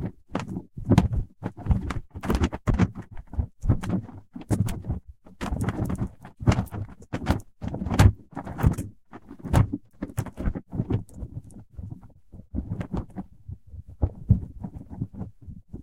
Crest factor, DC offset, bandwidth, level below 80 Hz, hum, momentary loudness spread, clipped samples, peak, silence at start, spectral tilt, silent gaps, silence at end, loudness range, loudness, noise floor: 24 dB; 0.3%; 16.5 kHz; -34 dBFS; none; 19 LU; under 0.1%; -2 dBFS; 0 s; -7.5 dB/octave; none; 0 s; 8 LU; -28 LUFS; -48 dBFS